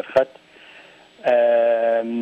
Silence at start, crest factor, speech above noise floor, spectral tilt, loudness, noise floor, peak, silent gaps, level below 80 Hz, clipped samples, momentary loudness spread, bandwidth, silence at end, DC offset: 0.05 s; 14 dB; 29 dB; -6 dB/octave; -19 LUFS; -47 dBFS; -6 dBFS; none; -68 dBFS; under 0.1%; 9 LU; 6.4 kHz; 0 s; under 0.1%